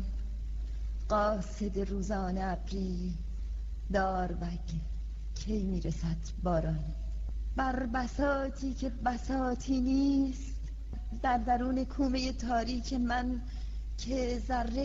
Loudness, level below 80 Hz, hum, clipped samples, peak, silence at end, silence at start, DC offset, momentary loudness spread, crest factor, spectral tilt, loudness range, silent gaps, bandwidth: -34 LUFS; -38 dBFS; none; under 0.1%; -16 dBFS; 0 s; 0 s; under 0.1%; 10 LU; 16 dB; -6.5 dB/octave; 4 LU; none; 7.8 kHz